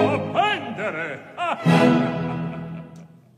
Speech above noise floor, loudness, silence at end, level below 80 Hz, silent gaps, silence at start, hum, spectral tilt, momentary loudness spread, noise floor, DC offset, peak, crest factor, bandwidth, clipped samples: 24 dB; -22 LUFS; 0.3 s; -60 dBFS; none; 0 s; none; -7 dB/octave; 17 LU; -45 dBFS; under 0.1%; -4 dBFS; 18 dB; 12 kHz; under 0.1%